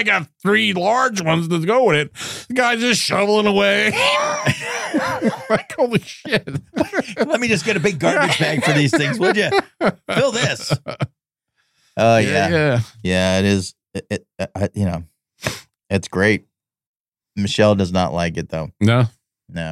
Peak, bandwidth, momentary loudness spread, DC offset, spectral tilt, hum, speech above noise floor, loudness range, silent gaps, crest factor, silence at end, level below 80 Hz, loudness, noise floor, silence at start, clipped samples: -4 dBFS; 15.5 kHz; 12 LU; under 0.1%; -5 dB/octave; none; 53 dB; 5 LU; 16.87-17.12 s; 16 dB; 0 s; -54 dBFS; -18 LUFS; -71 dBFS; 0 s; under 0.1%